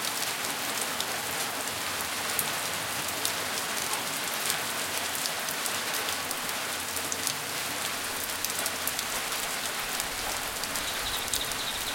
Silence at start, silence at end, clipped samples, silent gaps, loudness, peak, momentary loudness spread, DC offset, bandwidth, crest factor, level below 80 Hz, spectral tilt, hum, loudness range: 0 s; 0 s; under 0.1%; none; -29 LUFS; -4 dBFS; 2 LU; under 0.1%; 17 kHz; 28 dB; -58 dBFS; -0.5 dB/octave; none; 1 LU